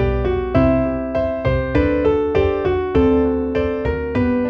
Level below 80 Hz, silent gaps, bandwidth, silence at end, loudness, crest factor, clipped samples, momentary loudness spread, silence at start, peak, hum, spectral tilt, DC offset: -28 dBFS; none; 6.2 kHz; 0 s; -18 LUFS; 14 dB; under 0.1%; 5 LU; 0 s; -2 dBFS; none; -9.5 dB/octave; under 0.1%